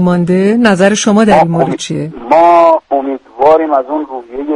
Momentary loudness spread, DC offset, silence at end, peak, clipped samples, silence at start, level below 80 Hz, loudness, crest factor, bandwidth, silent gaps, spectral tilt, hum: 12 LU; under 0.1%; 0 s; 0 dBFS; 0.4%; 0 s; -44 dBFS; -10 LUFS; 10 dB; 11.5 kHz; none; -5.5 dB/octave; none